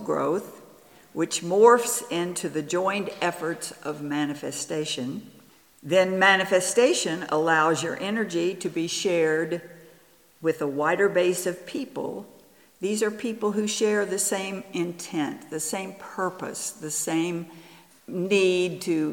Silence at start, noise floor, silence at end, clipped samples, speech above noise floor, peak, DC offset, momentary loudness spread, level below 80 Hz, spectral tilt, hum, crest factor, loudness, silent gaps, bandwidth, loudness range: 0 s; -57 dBFS; 0 s; under 0.1%; 32 dB; -4 dBFS; under 0.1%; 13 LU; -76 dBFS; -3.5 dB/octave; none; 22 dB; -25 LUFS; none; 19 kHz; 7 LU